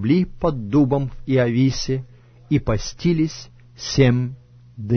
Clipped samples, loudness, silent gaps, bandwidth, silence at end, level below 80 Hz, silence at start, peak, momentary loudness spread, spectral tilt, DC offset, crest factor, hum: under 0.1%; -21 LUFS; none; 6.6 kHz; 0 s; -38 dBFS; 0 s; -4 dBFS; 10 LU; -6.5 dB/octave; under 0.1%; 16 dB; none